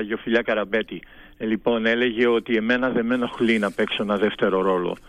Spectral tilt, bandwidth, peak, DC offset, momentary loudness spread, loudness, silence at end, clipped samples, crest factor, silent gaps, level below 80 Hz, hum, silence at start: -6 dB/octave; 11 kHz; -8 dBFS; under 0.1%; 6 LU; -22 LUFS; 0.1 s; under 0.1%; 14 dB; none; -54 dBFS; none; 0 s